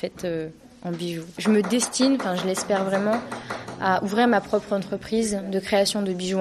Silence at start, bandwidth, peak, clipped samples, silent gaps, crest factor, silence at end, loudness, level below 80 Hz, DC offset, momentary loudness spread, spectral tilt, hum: 0 s; 13 kHz; -8 dBFS; under 0.1%; none; 16 dB; 0 s; -24 LUFS; -58 dBFS; under 0.1%; 11 LU; -4.5 dB/octave; none